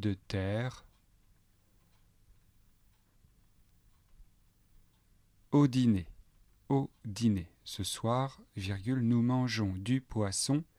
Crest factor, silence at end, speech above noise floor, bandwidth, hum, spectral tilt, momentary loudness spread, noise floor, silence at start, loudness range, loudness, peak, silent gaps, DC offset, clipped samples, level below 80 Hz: 18 dB; 0.15 s; 36 dB; 14.5 kHz; none; -6 dB/octave; 11 LU; -67 dBFS; 0 s; 9 LU; -33 LUFS; -16 dBFS; none; under 0.1%; under 0.1%; -60 dBFS